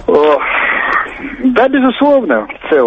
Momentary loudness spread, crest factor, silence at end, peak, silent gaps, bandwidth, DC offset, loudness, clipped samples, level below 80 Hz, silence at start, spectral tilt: 6 LU; 12 dB; 0 s; 0 dBFS; none; 6.6 kHz; under 0.1%; -12 LUFS; under 0.1%; -42 dBFS; 0 s; -6.5 dB/octave